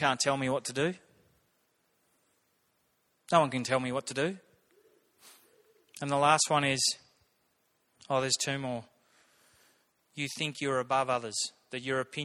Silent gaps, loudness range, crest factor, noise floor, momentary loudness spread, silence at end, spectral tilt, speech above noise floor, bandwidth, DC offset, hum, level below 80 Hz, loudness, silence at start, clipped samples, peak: none; 5 LU; 24 dB; -74 dBFS; 13 LU; 0 s; -3 dB/octave; 44 dB; 16.5 kHz; under 0.1%; none; -72 dBFS; -30 LUFS; 0 s; under 0.1%; -10 dBFS